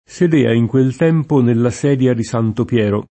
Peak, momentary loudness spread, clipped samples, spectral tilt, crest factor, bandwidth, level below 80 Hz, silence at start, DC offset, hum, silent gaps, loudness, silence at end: -2 dBFS; 4 LU; under 0.1%; -7.5 dB/octave; 14 dB; 8.8 kHz; -50 dBFS; 0.1 s; under 0.1%; none; none; -15 LUFS; 0.05 s